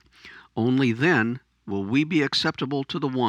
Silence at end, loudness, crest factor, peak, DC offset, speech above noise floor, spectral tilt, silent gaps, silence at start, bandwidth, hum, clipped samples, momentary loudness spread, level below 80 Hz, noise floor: 0 s; -24 LUFS; 18 dB; -6 dBFS; under 0.1%; 25 dB; -6 dB/octave; none; 0.25 s; 10.5 kHz; none; under 0.1%; 11 LU; -64 dBFS; -48 dBFS